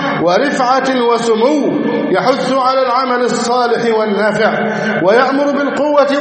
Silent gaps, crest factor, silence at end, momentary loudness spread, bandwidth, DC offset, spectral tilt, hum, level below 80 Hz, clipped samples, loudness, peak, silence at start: none; 12 dB; 0 s; 3 LU; 8.8 kHz; under 0.1%; -5 dB/octave; none; -60 dBFS; under 0.1%; -13 LUFS; 0 dBFS; 0 s